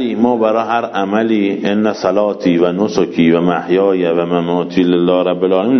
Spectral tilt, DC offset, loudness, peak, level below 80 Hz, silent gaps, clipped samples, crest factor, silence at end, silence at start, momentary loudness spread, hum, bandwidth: -7 dB/octave; under 0.1%; -14 LUFS; 0 dBFS; -54 dBFS; none; under 0.1%; 14 dB; 0 s; 0 s; 3 LU; none; 6.4 kHz